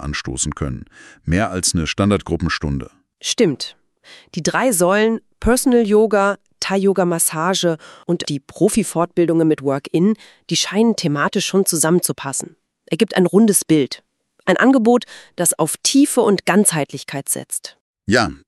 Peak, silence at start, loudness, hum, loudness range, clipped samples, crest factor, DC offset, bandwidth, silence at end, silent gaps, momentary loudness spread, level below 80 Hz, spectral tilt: 0 dBFS; 0 s; -17 LUFS; none; 4 LU; under 0.1%; 18 dB; under 0.1%; 13.5 kHz; 0.1 s; 17.80-17.94 s; 13 LU; -40 dBFS; -4 dB/octave